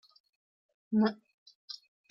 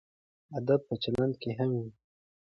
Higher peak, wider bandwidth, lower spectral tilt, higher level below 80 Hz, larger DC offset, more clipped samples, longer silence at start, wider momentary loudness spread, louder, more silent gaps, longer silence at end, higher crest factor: about the same, -16 dBFS vs -14 dBFS; second, 6.2 kHz vs 8.6 kHz; about the same, -7.5 dB/octave vs -8.5 dB/octave; second, -78 dBFS vs -62 dBFS; neither; neither; first, 0.9 s vs 0.5 s; first, 18 LU vs 9 LU; about the same, -31 LUFS vs -32 LUFS; first, 1.34-1.46 s, 1.55-1.68 s vs none; second, 0.35 s vs 0.5 s; about the same, 20 dB vs 20 dB